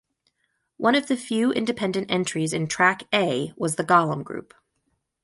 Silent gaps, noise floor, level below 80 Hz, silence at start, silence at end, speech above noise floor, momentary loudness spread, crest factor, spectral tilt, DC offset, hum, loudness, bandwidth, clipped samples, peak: none; -74 dBFS; -64 dBFS; 0.8 s; 0.8 s; 51 dB; 7 LU; 20 dB; -4.5 dB/octave; under 0.1%; none; -23 LUFS; 11.5 kHz; under 0.1%; -4 dBFS